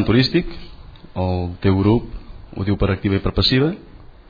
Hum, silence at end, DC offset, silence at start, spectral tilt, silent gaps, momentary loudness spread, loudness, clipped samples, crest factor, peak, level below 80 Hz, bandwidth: none; 0.2 s; under 0.1%; 0 s; -8 dB/octave; none; 19 LU; -19 LUFS; under 0.1%; 16 dB; -4 dBFS; -34 dBFS; 5 kHz